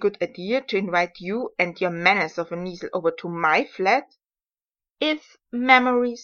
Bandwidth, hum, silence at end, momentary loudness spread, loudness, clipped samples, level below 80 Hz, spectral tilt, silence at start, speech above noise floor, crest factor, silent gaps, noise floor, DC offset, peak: 7 kHz; none; 0 s; 13 LU; -22 LUFS; under 0.1%; -68 dBFS; -5 dB/octave; 0 s; over 67 dB; 22 dB; none; under -90 dBFS; under 0.1%; 0 dBFS